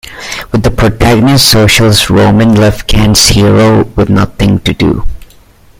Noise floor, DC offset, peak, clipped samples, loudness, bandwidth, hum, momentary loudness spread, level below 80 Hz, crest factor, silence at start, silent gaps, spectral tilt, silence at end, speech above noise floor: -39 dBFS; under 0.1%; 0 dBFS; 0.5%; -7 LUFS; over 20 kHz; none; 7 LU; -20 dBFS; 8 dB; 0.05 s; none; -4.5 dB/octave; 0.55 s; 33 dB